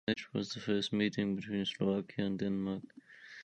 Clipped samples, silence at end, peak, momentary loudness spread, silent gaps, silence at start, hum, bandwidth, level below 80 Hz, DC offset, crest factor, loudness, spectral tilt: under 0.1%; 0 s; -20 dBFS; 11 LU; none; 0.05 s; none; 8.8 kHz; -68 dBFS; under 0.1%; 16 dB; -36 LUFS; -6 dB/octave